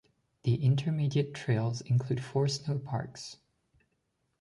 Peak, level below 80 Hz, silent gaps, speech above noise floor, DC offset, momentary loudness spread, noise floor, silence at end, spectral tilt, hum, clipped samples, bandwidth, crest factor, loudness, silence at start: -16 dBFS; -66 dBFS; none; 48 dB; under 0.1%; 9 LU; -78 dBFS; 1.05 s; -6.5 dB/octave; none; under 0.1%; 11.5 kHz; 16 dB; -31 LUFS; 0.45 s